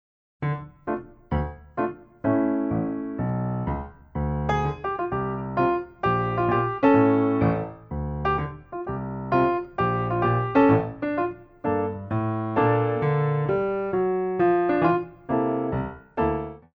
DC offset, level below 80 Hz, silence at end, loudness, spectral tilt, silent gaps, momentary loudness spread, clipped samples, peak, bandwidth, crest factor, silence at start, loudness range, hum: under 0.1%; -42 dBFS; 0.15 s; -25 LUFS; -10 dB/octave; none; 11 LU; under 0.1%; -6 dBFS; 6.6 kHz; 18 dB; 0.4 s; 4 LU; none